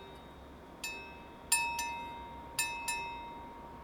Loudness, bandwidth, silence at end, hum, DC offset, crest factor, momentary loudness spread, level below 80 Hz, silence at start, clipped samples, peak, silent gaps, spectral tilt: -36 LUFS; over 20 kHz; 0 s; none; under 0.1%; 24 dB; 20 LU; -58 dBFS; 0 s; under 0.1%; -16 dBFS; none; -0.5 dB/octave